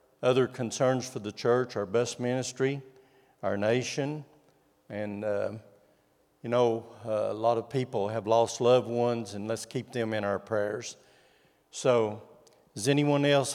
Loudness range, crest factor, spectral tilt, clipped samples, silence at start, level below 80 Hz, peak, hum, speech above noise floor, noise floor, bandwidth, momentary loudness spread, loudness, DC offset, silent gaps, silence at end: 5 LU; 18 dB; -5 dB/octave; under 0.1%; 0.2 s; -78 dBFS; -10 dBFS; none; 39 dB; -67 dBFS; 15 kHz; 12 LU; -29 LUFS; under 0.1%; none; 0 s